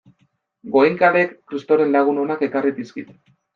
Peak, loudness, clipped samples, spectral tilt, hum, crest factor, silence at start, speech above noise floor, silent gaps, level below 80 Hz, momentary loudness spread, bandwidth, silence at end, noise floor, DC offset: -2 dBFS; -18 LUFS; under 0.1%; -7.5 dB/octave; none; 18 dB; 0.65 s; 46 dB; none; -70 dBFS; 16 LU; 6.8 kHz; 0.5 s; -65 dBFS; under 0.1%